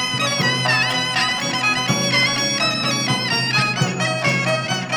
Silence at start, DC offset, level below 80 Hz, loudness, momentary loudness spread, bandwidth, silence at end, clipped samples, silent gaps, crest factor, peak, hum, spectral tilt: 0 s; under 0.1%; -56 dBFS; -18 LUFS; 3 LU; 19.5 kHz; 0 s; under 0.1%; none; 16 dB; -4 dBFS; none; -3 dB/octave